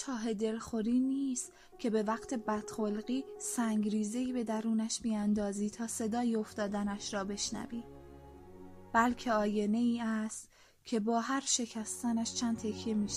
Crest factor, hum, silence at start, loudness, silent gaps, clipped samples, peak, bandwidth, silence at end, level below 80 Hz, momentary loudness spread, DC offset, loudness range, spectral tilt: 18 dB; none; 0 s; -34 LUFS; none; under 0.1%; -16 dBFS; 14.5 kHz; 0 s; -62 dBFS; 11 LU; under 0.1%; 2 LU; -4 dB/octave